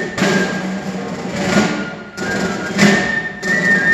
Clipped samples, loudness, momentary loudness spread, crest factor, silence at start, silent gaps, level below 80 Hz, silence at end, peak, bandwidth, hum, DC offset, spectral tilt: under 0.1%; -17 LUFS; 12 LU; 16 dB; 0 s; none; -46 dBFS; 0 s; 0 dBFS; 13 kHz; none; under 0.1%; -4.5 dB/octave